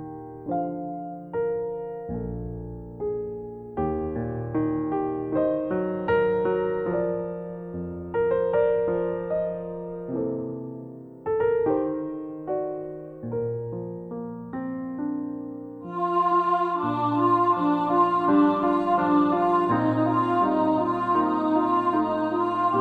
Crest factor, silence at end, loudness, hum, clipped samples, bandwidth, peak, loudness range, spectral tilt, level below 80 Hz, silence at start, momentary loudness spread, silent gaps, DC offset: 16 dB; 0 s; -25 LUFS; none; under 0.1%; 4.9 kHz; -10 dBFS; 10 LU; -9.5 dB/octave; -52 dBFS; 0 s; 14 LU; none; under 0.1%